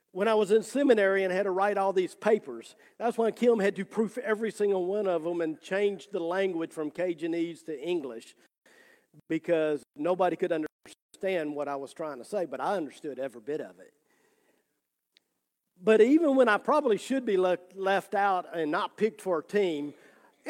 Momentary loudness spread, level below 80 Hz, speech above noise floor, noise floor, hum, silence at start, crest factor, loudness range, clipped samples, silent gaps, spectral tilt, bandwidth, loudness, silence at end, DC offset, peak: 13 LU; -84 dBFS; 54 dB; -82 dBFS; none; 0.15 s; 20 dB; 9 LU; under 0.1%; 10.72-10.79 s, 11.02-11.09 s; -5.5 dB/octave; 14.5 kHz; -28 LUFS; 0 s; under 0.1%; -10 dBFS